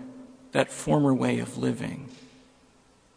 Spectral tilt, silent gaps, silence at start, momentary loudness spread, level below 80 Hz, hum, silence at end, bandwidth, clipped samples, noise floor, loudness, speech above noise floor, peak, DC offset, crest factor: -6 dB/octave; none; 0 s; 22 LU; -58 dBFS; 60 Hz at -55 dBFS; 0.9 s; 10.5 kHz; under 0.1%; -60 dBFS; -27 LUFS; 34 dB; -4 dBFS; under 0.1%; 24 dB